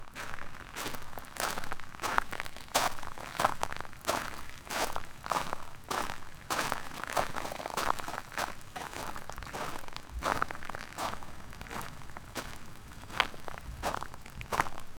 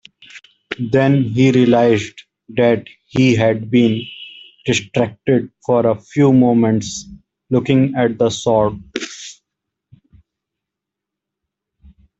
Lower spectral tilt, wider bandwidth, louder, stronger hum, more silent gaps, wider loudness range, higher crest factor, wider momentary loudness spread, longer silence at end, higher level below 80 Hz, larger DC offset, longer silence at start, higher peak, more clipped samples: second, -2.5 dB/octave vs -6.5 dB/octave; first, over 20 kHz vs 8 kHz; second, -36 LUFS vs -16 LUFS; neither; neither; about the same, 5 LU vs 6 LU; first, 30 dB vs 16 dB; second, 12 LU vs 16 LU; second, 0 s vs 2.9 s; about the same, -48 dBFS vs -52 dBFS; neither; second, 0 s vs 0.35 s; second, -6 dBFS vs 0 dBFS; neither